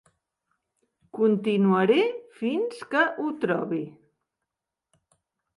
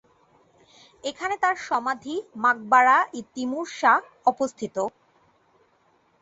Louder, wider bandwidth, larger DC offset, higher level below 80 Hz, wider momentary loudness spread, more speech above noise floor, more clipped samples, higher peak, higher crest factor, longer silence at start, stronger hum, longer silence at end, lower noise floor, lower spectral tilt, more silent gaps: about the same, -25 LUFS vs -24 LUFS; first, 11.5 kHz vs 8 kHz; neither; second, -76 dBFS vs -70 dBFS; about the same, 11 LU vs 13 LU; first, 63 dB vs 40 dB; neither; about the same, -8 dBFS vs -6 dBFS; about the same, 18 dB vs 20 dB; about the same, 1.15 s vs 1.05 s; neither; first, 1.7 s vs 1.35 s; first, -87 dBFS vs -64 dBFS; first, -7 dB/octave vs -3 dB/octave; neither